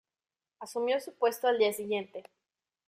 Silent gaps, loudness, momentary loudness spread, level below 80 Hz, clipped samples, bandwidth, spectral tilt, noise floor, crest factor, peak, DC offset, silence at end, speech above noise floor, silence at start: none; -31 LUFS; 18 LU; -82 dBFS; under 0.1%; 15.5 kHz; -3 dB/octave; under -90 dBFS; 18 dB; -14 dBFS; under 0.1%; 0.65 s; over 59 dB; 0.6 s